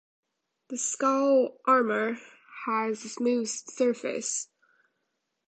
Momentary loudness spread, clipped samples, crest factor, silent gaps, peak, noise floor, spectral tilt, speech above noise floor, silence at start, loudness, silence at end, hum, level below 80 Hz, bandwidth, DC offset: 14 LU; under 0.1%; 18 dB; none; -10 dBFS; -80 dBFS; -3 dB/octave; 53 dB; 0.7 s; -27 LUFS; 1.05 s; none; -82 dBFS; 9.2 kHz; under 0.1%